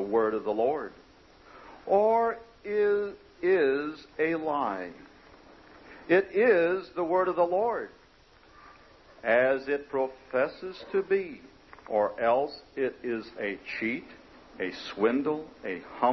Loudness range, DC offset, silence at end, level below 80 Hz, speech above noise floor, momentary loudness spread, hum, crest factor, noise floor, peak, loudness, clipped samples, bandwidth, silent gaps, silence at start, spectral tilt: 4 LU; under 0.1%; 0 s; -64 dBFS; 30 dB; 13 LU; none; 18 dB; -58 dBFS; -10 dBFS; -28 LUFS; under 0.1%; 6.2 kHz; none; 0 s; -7 dB/octave